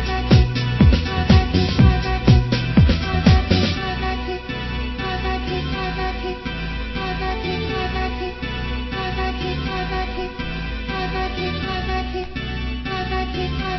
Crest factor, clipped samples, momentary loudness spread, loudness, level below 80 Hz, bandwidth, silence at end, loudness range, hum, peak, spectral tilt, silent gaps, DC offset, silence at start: 20 dB; under 0.1%; 11 LU; -21 LUFS; -24 dBFS; 6 kHz; 0 s; 8 LU; none; 0 dBFS; -7 dB/octave; none; under 0.1%; 0 s